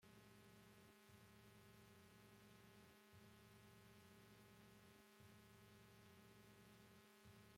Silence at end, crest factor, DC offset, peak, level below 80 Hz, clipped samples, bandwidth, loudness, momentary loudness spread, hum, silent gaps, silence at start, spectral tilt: 0 s; 16 dB; under 0.1%; -52 dBFS; -84 dBFS; under 0.1%; 16.5 kHz; -68 LUFS; 1 LU; none; none; 0 s; -4.5 dB/octave